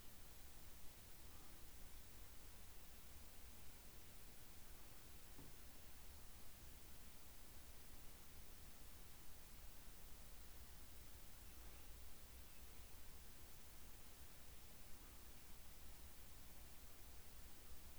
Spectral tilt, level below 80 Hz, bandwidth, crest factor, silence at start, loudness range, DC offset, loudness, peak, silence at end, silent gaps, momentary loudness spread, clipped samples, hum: -3 dB/octave; -64 dBFS; over 20 kHz; 14 dB; 0 s; 0 LU; 0.1%; -60 LUFS; -42 dBFS; 0 s; none; 0 LU; under 0.1%; none